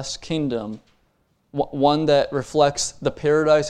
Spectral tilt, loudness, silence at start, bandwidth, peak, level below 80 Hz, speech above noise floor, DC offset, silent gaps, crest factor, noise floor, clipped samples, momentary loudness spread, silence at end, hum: -4.5 dB/octave; -21 LUFS; 0 s; 12 kHz; -2 dBFS; -50 dBFS; 45 dB; under 0.1%; none; 18 dB; -65 dBFS; under 0.1%; 12 LU; 0 s; none